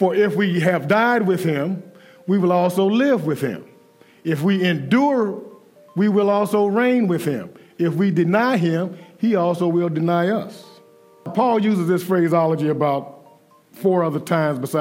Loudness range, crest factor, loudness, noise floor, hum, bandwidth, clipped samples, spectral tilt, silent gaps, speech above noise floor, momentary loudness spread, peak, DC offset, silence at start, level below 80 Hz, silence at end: 2 LU; 16 dB; -19 LUFS; -51 dBFS; none; 16 kHz; under 0.1%; -7 dB/octave; none; 33 dB; 9 LU; -4 dBFS; under 0.1%; 0 s; -76 dBFS; 0 s